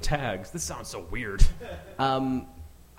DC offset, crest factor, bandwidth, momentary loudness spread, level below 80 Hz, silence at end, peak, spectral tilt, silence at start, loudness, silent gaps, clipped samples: under 0.1%; 22 dB; 15 kHz; 14 LU; -30 dBFS; 0.3 s; -4 dBFS; -4.5 dB/octave; 0 s; -30 LUFS; none; under 0.1%